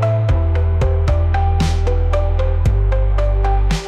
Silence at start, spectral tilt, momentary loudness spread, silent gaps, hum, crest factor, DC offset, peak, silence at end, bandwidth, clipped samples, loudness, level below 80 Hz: 0 s; -7 dB/octave; 1 LU; none; none; 8 dB; under 0.1%; -6 dBFS; 0 s; 9.2 kHz; under 0.1%; -17 LUFS; -18 dBFS